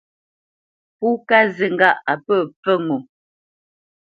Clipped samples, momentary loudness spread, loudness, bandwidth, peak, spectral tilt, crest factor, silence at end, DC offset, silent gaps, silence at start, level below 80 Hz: under 0.1%; 9 LU; -18 LUFS; 7.2 kHz; 0 dBFS; -7 dB/octave; 20 dB; 1.05 s; under 0.1%; 2.56-2.63 s; 1 s; -70 dBFS